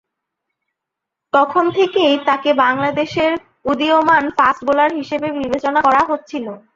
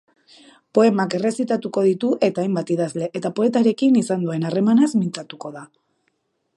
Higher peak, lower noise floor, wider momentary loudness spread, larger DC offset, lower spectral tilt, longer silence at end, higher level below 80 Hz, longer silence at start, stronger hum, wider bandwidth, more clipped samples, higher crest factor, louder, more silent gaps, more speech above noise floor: about the same, -2 dBFS vs -4 dBFS; first, -81 dBFS vs -70 dBFS; about the same, 8 LU vs 10 LU; neither; second, -5 dB/octave vs -6.5 dB/octave; second, 0.15 s vs 0.9 s; first, -54 dBFS vs -72 dBFS; first, 1.35 s vs 0.75 s; neither; second, 7.6 kHz vs 11.5 kHz; neither; about the same, 16 dB vs 18 dB; first, -16 LUFS vs -20 LUFS; neither; first, 66 dB vs 51 dB